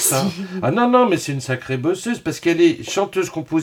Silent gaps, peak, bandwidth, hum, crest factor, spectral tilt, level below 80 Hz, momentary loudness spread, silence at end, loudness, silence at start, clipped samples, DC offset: none; -2 dBFS; 19 kHz; none; 16 dB; -4.5 dB/octave; -58 dBFS; 8 LU; 0 s; -19 LUFS; 0 s; under 0.1%; under 0.1%